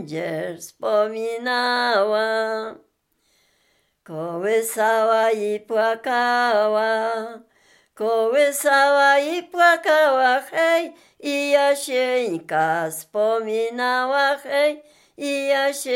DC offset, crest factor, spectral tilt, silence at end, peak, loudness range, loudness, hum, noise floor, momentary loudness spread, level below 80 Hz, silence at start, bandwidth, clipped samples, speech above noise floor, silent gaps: under 0.1%; 16 dB; -2.5 dB/octave; 0 s; -4 dBFS; 6 LU; -20 LUFS; none; -67 dBFS; 11 LU; -80 dBFS; 0 s; 17 kHz; under 0.1%; 46 dB; none